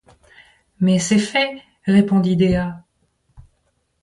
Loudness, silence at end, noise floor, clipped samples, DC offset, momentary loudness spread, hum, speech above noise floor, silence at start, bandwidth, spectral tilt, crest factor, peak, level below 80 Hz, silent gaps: -18 LUFS; 0.6 s; -67 dBFS; under 0.1%; under 0.1%; 12 LU; none; 50 dB; 0.8 s; 11.5 kHz; -5.5 dB/octave; 18 dB; -2 dBFS; -44 dBFS; none